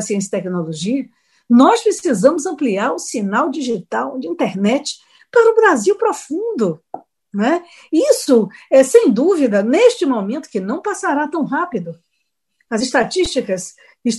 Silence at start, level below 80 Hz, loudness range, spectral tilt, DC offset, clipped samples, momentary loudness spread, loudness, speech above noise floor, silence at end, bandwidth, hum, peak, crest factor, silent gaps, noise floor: 0 s; -54 dBFS; 6 LU; -4.5 dB/octave; under 0.1%; under 0.1%; 12 LU; -16 LUFS; 56 dB; 0 s; 12.5 kHz; none; 0 dBFS; 16 dB; none; -71 dBFS